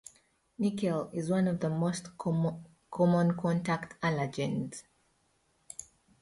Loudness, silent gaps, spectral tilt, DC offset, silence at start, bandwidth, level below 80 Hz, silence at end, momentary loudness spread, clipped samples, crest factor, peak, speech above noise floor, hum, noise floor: -31 LUFS; none; -7 dB/octave; under 0.1%; 0.6 s; 11.5 kHz; -66 dBFS; 0.4 s; 18 LU; under 0.1%; 18 dB; -16 dBFS; 42 dB; none; -72 dBFS